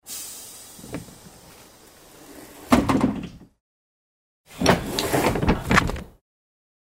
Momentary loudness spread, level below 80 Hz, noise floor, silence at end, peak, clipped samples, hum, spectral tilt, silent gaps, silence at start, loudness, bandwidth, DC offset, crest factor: 22 LU; -38 dBFS; -50 dBFS; 0.85 s; -2 dBFS; under 0.1%; none; -5 dB/octave; 3.60-4.44 s; 0.05 s; -22 LUFS; 16 kHz; under 0.1%; 24 dB